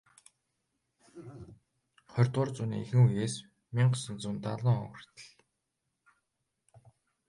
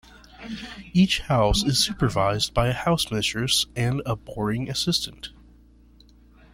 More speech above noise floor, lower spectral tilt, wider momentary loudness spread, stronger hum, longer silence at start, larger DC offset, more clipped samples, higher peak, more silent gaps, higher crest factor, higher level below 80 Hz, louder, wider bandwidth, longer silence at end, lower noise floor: first, 54 dB vs 29 dB; first, -6.5 dB/octave vs -4.5 dB/octave; first, 24 LU vs 16 LU; neither; first, 1.15 s vs 0.15 s; neither; neither; second, -12 dBFS vs -6 dBFS; neither; about the same, 20 dB vs 18 dB; second, -66 dBFS vs -40 dBFS; second, -31 LUFS vs -23 LUFS; second, 11.5 kHz vs 16.5 kHz; first, 2 s vs 1.25 s; first, -84 dBFS vs -53 dBFS